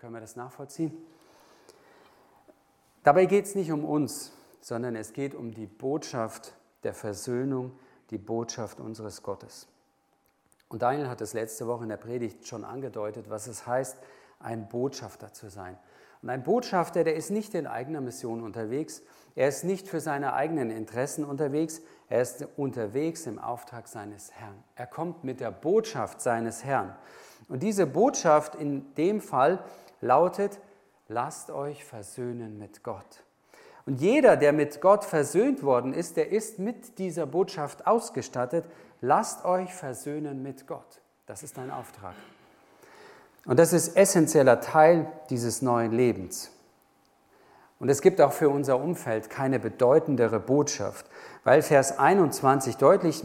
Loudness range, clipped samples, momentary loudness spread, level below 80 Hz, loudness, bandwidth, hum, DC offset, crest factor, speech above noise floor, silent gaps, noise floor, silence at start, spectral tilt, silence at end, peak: 12 LU; under 0.1%; 21 LU; -72 dBFS; -27 LUFS; 17 kHz; none; under 0.1%; 22 dB; 43 dB; none; -70 dBFS; 0.05 s; -5.5 dB/octave; 0 s; -6 dBFS